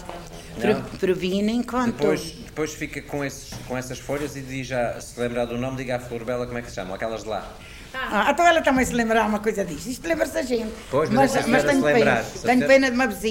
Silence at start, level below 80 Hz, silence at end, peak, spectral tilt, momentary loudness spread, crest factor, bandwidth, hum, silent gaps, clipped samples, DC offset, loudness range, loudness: 0 s; -44 dBFS; 0 s; -6 dBFS; -5 dB/octave; 14 LU; 18 dB; 16.5 kHz; none; none; under 0.1%; under 0.1%; 8 LU; -23 LUFS